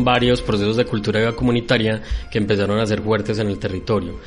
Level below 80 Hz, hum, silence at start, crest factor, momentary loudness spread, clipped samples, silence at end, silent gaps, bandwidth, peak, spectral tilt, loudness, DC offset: -34 dBFS; none; 0 s; 16 dB; 6 LU; under 0.1%; 0 s; none; 10.5 kHz; -2 dBFS; -6.5 dB/octave; -20 LUFS; under 0.1%